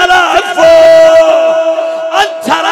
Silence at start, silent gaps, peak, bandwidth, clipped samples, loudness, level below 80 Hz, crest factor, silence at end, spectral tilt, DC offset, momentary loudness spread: 0 s; none; 0 dBFS; 13 kHz; 9%; -7 LUFS; -42 dBFS; 6 dB; 0 s; -2 dB/octave; under 0.1%; 9 LU